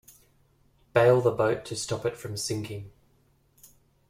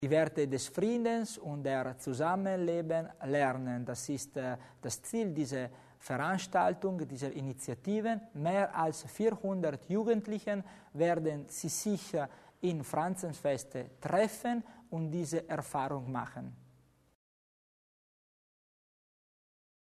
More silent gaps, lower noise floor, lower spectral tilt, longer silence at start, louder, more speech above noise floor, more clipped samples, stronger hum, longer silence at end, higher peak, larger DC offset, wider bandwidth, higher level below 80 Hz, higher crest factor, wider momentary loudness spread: neither; about the same, -65 dBFS vs -66 dBFS; about the same, -5 dB/octave vs -5.5 dB/octave; first, 0.95 s vs 0 s; first, -26 LUFS vs -35 LUFS; first, 39 dB vs 31 dB; neither; neither; second, 1.2 s vs 3.35 s; first, -8 dBFS vs -16 dBFS; neither; first, 16 kHz vs 13.5 kHz; first, -60 dBFS vs -72 dBFS; about the same, 20 dB vs 20 dB; first, 13 LU vs 9 LU